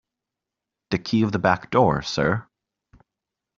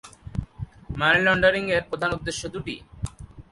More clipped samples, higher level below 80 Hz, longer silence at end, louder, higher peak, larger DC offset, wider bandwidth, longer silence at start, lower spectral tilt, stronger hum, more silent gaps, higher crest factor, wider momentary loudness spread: neither; second, -52 dBFS vs -42 dBFS; first, 1.15 s vs 0.1 s; about the same, -22 LUFS vs -23 LUFS; about the same, -4 dBFS vs -6 dBFS; neither; second, 7.6 kHz vs 11.5 kHz; first, 0.9 s vs 0.05 s; about the same, -5 dB/octave vs -4.5 dB/octave; neither; neither; about the same, 22 dB vs 20 dB; second, 9 LU vs 18 LU